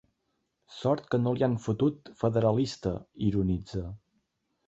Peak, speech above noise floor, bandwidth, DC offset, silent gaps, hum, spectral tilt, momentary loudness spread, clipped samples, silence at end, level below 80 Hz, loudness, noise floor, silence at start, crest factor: -12 dBFS; 50 dB; 8 kHz; under 0.1%; none; none; -8 dB/octave; 10 LU; under 0.1%; 0.7 s; -50 dBFS; -29 LUFS; -78 dBFS; 0.7 s; 18 dB